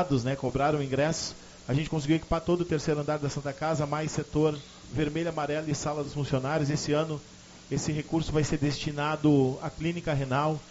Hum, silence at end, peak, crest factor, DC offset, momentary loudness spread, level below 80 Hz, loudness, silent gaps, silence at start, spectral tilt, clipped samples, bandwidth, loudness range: none; 0 s; -12 dBFS; 18 dB; under 0.1%; 6 LU; -48 dBFS; -29 LUFS; none; 0 s; -6 dB/octave; under 0.1%; 8 kHz; 2 LU